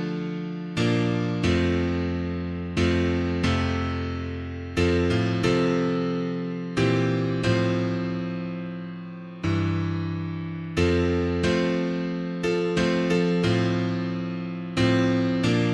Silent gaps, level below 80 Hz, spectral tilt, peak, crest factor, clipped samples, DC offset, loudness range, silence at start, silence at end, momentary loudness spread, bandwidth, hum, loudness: none; -44 dBFS; -7 dB/octave; -8 dBFS; 16 dB; under 0.1%; under 0.1%; 3 LU; 0 s; 0 s; 9 LU; 10 kHz; none; -25 LUFS